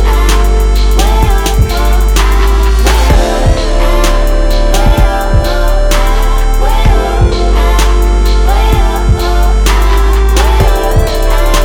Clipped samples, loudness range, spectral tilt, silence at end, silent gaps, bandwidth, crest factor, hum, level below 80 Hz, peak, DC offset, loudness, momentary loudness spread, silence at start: 0.5%; 1 LU; -5 dB/octave; 0 s; none; 17 kHz; 6 dB; none; -8 dBFS; 0 dBFS; under 0.1%; -11 LUFS; 3 LU; 0 s